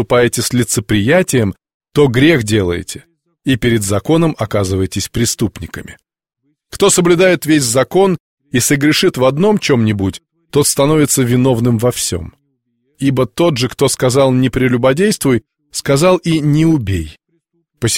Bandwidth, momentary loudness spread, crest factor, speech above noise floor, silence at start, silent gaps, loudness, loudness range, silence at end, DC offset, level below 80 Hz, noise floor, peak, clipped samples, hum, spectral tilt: 16.5 kHz; 10 LU; 14 dB; 52 dB; 0 s; 1.74-1.80 s, 8.20-8.37 s; -13 LUFS; 3 LU; 0 s; under 0.1%; -40 dBFS; -65 dBFS; 0 dBFS; under 0.1%; none; -5 dB/octave